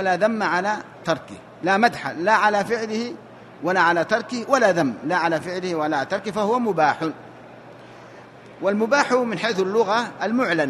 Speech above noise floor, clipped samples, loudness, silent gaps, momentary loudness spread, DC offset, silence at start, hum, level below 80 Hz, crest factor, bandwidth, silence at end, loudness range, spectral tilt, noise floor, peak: 22 dB; under 0.1%; -21 LUFS; none; 9 LU; under 0.1%; 0 s; none; -66 dBFS; 18 dB; 13 kHz; 0 s; 3 LU; -5 dB/octave; -43 dBFS; -4 dBFS